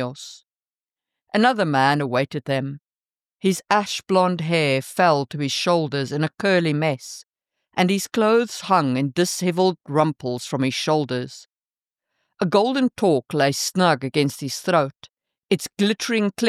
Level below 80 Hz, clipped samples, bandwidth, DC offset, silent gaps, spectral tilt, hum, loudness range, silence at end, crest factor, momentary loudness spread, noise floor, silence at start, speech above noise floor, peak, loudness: -70 dBFS; under 0.1%; 15.5 kHz; under 0.1%; 11.65-11.69 s, 15.38-15.42 s; -5 dB/octave; none; 2 LU; 0 s; 18 dB; 8 LU; under -90 dBFS; 0 s; over 69 dB; -4 dBFS; -21 LUFS